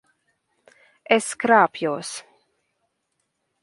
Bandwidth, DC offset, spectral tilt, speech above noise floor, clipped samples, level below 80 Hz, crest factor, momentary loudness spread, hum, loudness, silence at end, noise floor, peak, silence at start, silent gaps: 11.5 kHz; under 0.1%; -3.5 dB/octave; 55 dB; under 0.1%; -74 dBFS; 22 dB; 16 LU; none; -20 LUFS; 1.4 s; -75 dBFS; -2 dBFS; 1.1 s; none